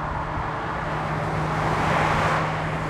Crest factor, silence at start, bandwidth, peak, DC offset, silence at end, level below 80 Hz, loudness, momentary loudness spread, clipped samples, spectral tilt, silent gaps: 14 dB; 0 s; 12.5 kHz; -10 dBFS; under 0.1%; 0 s; -38 dBFS; -24 LUFS; 7 LU; under 0.1%; -6 dB/octave; none